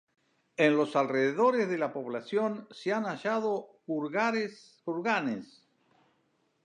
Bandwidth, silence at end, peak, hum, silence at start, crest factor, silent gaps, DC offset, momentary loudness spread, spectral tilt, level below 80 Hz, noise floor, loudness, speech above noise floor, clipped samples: 10 kHz; 1.2 s; -10 dBFS; none; 0.6 s; 22 dB; none; under 0.1%; 11 LU; -6 dB/octave; -86 dBFS; -73 dBFS; -30 LUFS; 43 dB; under 0.1%